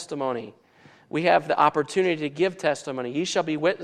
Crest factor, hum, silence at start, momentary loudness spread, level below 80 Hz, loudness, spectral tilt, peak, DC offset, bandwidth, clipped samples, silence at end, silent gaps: 20 dB; none; 0 s; 9 LU; -72 dBFS; -24 LUFS; -4.5 dB/octave; -6 dBFS; under 0.1%; 10.5 kHz; under 0.1%; 0 s; none